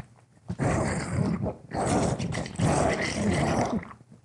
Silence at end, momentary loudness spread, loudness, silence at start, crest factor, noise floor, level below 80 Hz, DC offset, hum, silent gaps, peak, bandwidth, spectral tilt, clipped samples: 0.1 s; 7 LU; -28 LUFS; 0.45 s; 16 dB; -48 dBFS; -46 dBFS; under 0.1%; none; none; -12 dBFS; 11.5 kHz; -5.5 dB/octave; under 0.1%